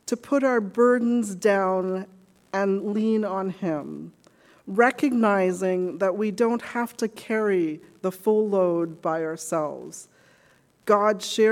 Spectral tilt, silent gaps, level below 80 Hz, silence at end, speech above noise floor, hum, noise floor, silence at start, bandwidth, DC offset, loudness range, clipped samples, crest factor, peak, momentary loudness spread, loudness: -5.5 dB/octave; none; -74 dBFS; 0 s; 37 dB; none; -60 dBFS; 0.05 s; 17 kHz; under 0.1%; 3 LU; under 0.1%; 18 dB; -6 dBFS; 11 LU; -24 LUFS